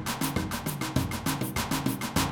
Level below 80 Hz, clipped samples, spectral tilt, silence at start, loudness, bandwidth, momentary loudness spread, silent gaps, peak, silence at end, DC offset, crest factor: -44 dBFS; under 0.1%; -4 dB/octave; 0 s; -30 LUFS; 19 kHz; 2 LU; none; -12 dBFS; 0 s; under 0.1%; 18 dB